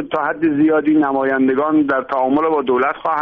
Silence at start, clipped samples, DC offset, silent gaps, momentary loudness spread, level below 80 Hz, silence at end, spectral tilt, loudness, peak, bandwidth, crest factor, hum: 0 s; under 0.1%; under 0.1%; none; 3 LU; -56 dBFS; 0 s; -5 dB/octave; -16 LUFS; -6 dBFS; 4 kHz; 10 dB; none